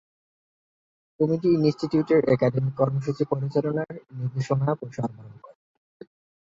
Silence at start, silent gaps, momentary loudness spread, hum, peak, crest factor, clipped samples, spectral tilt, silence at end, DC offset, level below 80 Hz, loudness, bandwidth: 1.2 s; none; 11 LU; none; -6 dBFS; 18 dB; under 0.1%; -8.5 dB/octave; 1.05 s; under 0.1%; -62 dBFS; -25 LUFS; 7.6 kHz